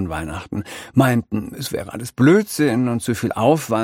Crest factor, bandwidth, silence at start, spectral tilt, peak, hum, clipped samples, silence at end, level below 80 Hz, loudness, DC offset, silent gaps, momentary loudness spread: 18 dB; 16.5 kHz; 0 s; -6 dB/octave; 0 dBFS; none; under 0.1%; 0 s; -46 dBFS; -19 LUFS; under 0.1%; none; 13 LU